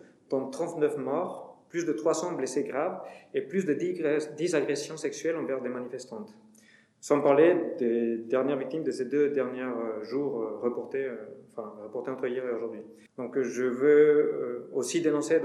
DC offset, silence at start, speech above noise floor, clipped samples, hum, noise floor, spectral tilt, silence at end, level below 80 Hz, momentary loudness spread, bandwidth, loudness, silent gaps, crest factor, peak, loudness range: under 0.1%; 0.3 s; 31 dB; under 0.1%; none; -60 dBFS; -5 dB/octave; 0 s; -86 dBFS; 16 LU; 12 kHz; -29 LUFS; none; 20 dB; -10 dBFS; 7 LU